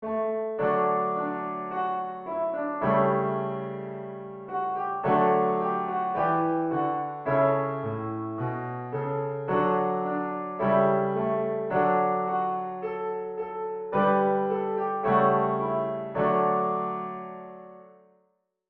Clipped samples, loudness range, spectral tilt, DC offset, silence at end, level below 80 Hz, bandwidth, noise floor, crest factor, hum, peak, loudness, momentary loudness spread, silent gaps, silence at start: under 0.1%; 3 LU; -6.5 dB/octave; under 0.1%; 0.8 s; -68 dBFS; 4.5 kHz; -72 dBFS; 16 dB; none; -10 dBFS; -27 LUFS; 10 LU; none; 0 s